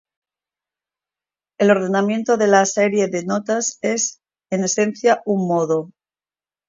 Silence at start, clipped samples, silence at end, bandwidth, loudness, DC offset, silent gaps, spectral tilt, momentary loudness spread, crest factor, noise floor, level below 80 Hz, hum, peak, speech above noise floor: 1.6 s; under 0.1%; 0.8 s; 7.8 kHz; -19 LUFS; under 0.1%; none; -4.5 dB/octave; 8 LU; 20 dB; under -90 dBFS; -70 dBFS; none; 0 dBFS; over 72 dB